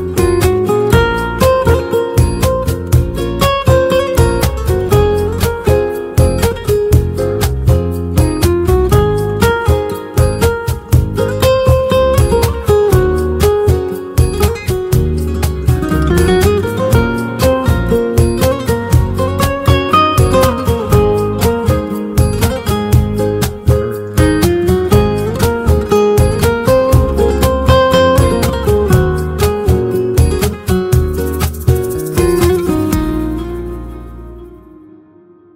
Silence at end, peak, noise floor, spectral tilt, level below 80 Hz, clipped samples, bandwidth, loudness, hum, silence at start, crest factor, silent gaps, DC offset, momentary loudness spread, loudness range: 1 s; 0 dBFS; -43 dBFS; -6.5 dB/octave; -20 dBFS; under 0.1%; 16.5 kHz; -13 LUFS; none; 0 s; 12 dB; none; under 0.1%; 6 LU; 3 LU